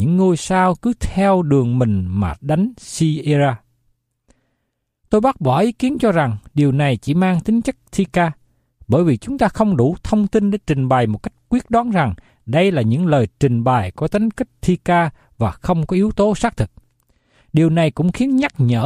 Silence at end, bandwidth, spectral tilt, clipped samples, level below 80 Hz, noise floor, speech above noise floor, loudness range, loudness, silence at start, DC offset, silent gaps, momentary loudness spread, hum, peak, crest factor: 0 s; 12.5 kHz; -7.5 dB/octave; under 0.1%; -40 dBFS; -73 dBFS; 56 dB; 2 LU; -17 LUFS; 0 s; under 0.1%; none; 6 LU; none; -2 dBFS; 16 dB